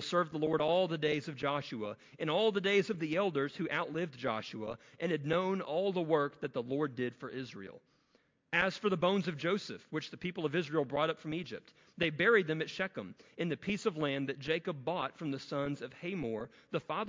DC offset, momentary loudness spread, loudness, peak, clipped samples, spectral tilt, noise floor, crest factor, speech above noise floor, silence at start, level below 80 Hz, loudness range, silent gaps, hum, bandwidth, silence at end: under 0.1%; 11 LU; -35 LUFS; -14 dBFS; under 0.1%; -6 dB/octave; -73 dBFS; 20 dB; 38 dB; 0 s; -72 dBFS; 3 LU; none; none; 7.6 kHz; 0 s